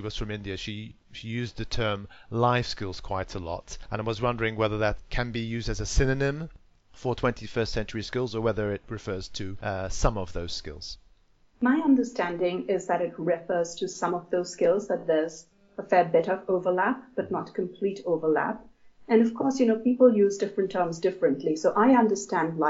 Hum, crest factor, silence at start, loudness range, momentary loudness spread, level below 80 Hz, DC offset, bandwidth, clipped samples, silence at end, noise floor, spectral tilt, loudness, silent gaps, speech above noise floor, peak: none; 20 dB; 0 s; 6 LU; 13 LU; -42 dBFS; under 0.1%; 8 kHz; under 0.1%; 0 s; -60 dBFS; -5 dB/octave; -27 LUFS; none; 34 dB; -8 dBFS